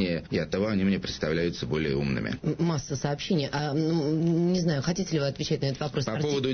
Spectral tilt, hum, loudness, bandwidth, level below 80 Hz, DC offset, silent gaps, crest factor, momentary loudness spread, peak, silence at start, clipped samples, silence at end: -6 dB/octave; none; -28 LUFS; 6.6 kHz; -50 dBFS; under 0.1%; none; 14 dB; 4 LU; -12 dBFS; 0 s; under 0.1%; 0 s